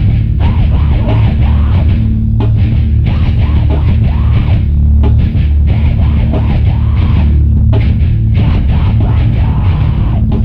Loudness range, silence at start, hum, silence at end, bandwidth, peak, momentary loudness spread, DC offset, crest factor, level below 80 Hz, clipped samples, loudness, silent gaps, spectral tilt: 0 LU; 0 s; none; 0 s; 4.6 kHz; 0 dBFS; 2 LU; under 0.1%; 8 dB; -12 dBFS; under 0.1%; -11 LUFS; none; -10.5 dB/octave